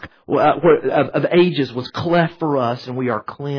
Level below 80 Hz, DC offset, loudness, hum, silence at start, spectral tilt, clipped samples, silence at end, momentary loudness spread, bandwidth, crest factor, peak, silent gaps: -54 dBFS; under 0.1%; -18 LUFS; none; 0 s; -8 dB/octave; under 0.1%; 0 s; 9 LU; 5.4 kHz; 16 dB; -2 dBFS; none